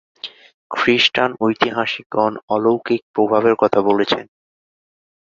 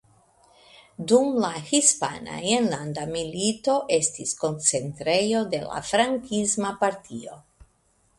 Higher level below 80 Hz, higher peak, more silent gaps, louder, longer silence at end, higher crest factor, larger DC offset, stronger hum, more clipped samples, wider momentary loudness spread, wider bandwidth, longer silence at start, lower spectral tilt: about the same, -60 dBFS vs -60 dBFS; first, 0 dBFS vs -4 dBFS; first, 0.54-0.70 s, 2.06-2.10 s, 2.43-2.48 s, 3.02-3.14 s vs none; first, -17 LUFS vs -24 LUFS; first, 1.1 s vs 0.8 s; about the same, 18 dB vs 20 dB; neither; neither; neither; about the same, 9 LU vs 10 LU; second, 7.6 kHz vs 11.5 kHz; second, 0.25 s vs 1 s; first, -5 dB/octave vs -3 dB/octave